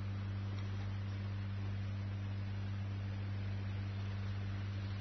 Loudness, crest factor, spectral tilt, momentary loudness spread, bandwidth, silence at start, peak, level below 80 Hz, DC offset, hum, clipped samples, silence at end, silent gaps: -42 LUFS; 8 dB; -7 dB/octave; 0 LU; 6.2 kHz; 0 s; -32 dBFS; -56 dBFS; under 0.1%; 50 Hz at -60 dBFS; under 0.1%; 0 s; none